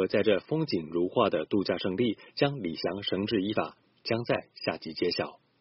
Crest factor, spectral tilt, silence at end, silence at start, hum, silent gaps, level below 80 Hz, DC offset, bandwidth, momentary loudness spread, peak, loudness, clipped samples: 20 dB; -4 dB/octave; 0.25 s; 0 s; none; none; -66 dBFS; under 0.1%; 6 kHz; 7 LU; -10 dBFS; -30 LUFS; under 0.1%